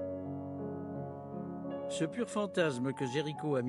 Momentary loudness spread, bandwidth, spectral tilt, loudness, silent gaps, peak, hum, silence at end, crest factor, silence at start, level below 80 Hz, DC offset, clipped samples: 10 LU; 12 kHz; -6 dB/octave; -37 LUFS; none; -18 dBFS; none; 0 s; 18 dB; 0 s; -74 dBFS; under 0.1%; under 0.1%